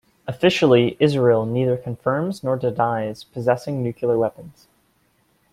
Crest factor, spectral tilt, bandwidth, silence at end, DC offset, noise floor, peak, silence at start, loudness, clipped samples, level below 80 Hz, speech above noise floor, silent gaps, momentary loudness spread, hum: 18 dB; -7 dB/octave; 14 kHz; 1 s; under 0.1%; -63 dBFS; -4 dBFS; 0.25 s; -20 LUFS; under 0.1%; -58 dBFS; 43 dB; none; 10 LU; none